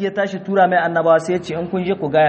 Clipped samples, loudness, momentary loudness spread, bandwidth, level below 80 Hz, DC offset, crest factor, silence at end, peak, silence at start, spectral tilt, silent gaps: under 0.1%; -18 LUFS; 7 LU; 8.8 kHz; -54 dBFS; under 0.1%; 16 dB; 0 s; -2 dBFS; 0 s; -6.5 dB/octave; none